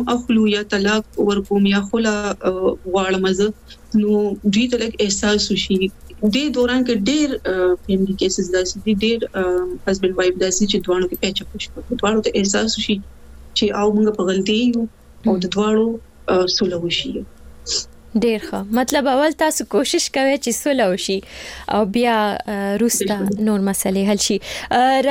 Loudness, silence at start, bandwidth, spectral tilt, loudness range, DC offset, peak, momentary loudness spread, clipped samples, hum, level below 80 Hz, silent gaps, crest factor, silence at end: -19 LUFS; 0 s; 17 kHz; -4 dB/octave; 2 LU; under 0.1%; -2 dBFS; 6 LU; under 0.1%; none; -42 dBFS; none; 18 dB; 0 s